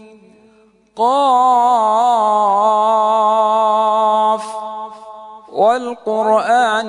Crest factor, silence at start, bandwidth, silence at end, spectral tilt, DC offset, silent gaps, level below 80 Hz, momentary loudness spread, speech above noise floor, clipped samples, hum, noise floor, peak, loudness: 12 dB; 0.95 s; 11 kHz; 0 s; -3.5 dB/octave; under 0.1%; none; -72 dBFS; 14 LU; 38 dB; under 0.1%; none; -51 dBFS; -2 dBFS; -14 LUFS